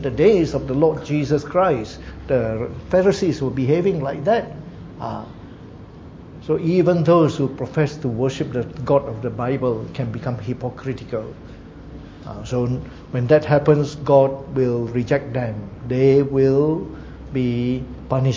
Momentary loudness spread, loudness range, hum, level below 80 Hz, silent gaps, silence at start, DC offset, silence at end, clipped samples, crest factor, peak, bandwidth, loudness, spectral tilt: 20 LU; 6 LU; none; -42 dBFS; none; 0 s; under 0.1%; 0 s; under 0.1%; 18 dB; -2 dBFS; 7.8 kHz; -20 LUFS; -8 dB/octave